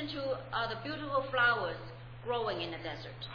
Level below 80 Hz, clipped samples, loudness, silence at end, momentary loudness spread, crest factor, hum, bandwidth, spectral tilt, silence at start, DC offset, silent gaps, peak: -58 dBFS; under 0.1%; -34 LUFS; 0 s; 14 LU; 20 dB; none; 5.4 kHz; -6.5 dB/octave; 0 s; under 0.1%; none; -16 dBFS